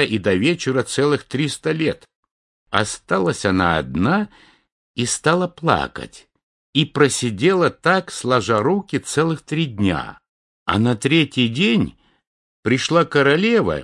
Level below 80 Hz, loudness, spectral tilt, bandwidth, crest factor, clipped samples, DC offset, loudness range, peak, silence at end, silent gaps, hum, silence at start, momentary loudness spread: -50 dBFS; -19 LUFS; -5 dB/octave; 11.5 kHz; 20 dB; under 0.1%; under 0.1%; 3 LU; 0 dBFS; 0 s; 2.15-2.23 s, 2.31-2.66 s, 4.72-4.94 s, 6.43-6.73 s, 10.29-10.66 s, 12.27-12.63 s; none; 0 s; 7 LU